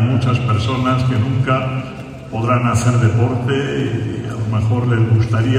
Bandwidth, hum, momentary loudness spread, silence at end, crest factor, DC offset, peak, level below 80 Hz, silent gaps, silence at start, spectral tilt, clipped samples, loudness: 10 kHz; none; 8 LU; 0 s; 14 dB; under 0.1%; -2 dBFS; -42 dBFS; none; 0 s; -7 dB/octave; under 0.1%; -17 LUFS